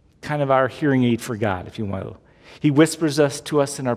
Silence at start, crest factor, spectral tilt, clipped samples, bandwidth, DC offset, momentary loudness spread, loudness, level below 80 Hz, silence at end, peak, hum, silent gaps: 0.25 s; 18 dB; -6 dB/octave; under 0.1%; 16 kHz; under 0.1%; 11 LU; -21 LUFS; -50 dBFS; 0 s; -4 dBFS; none; none